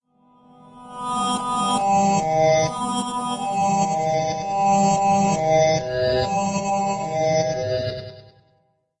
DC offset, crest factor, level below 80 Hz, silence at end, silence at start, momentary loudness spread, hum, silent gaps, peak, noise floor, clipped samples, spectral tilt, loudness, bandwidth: under 0.1%; 14 dB; -50 dBFS; 0.8 s; 0.75 s; 8 LU; none; none; -6 dBFS; -65 dBFS; under 0.1%; -4.5 dB/octave; -21 LUFS; 10.5 kHz